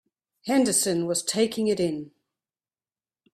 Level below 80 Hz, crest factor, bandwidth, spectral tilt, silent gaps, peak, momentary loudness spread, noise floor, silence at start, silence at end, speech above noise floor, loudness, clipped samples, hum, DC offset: -68 dBFS; 18 dB; 15.5 kHz; -3.5 dB/octave; none; -8 dBFS; 9 LU; under -90 dBFS; 0.45 s; 1.25 s; over 66 dB; -24 LUFS; under 0.1%; none; under 0.1%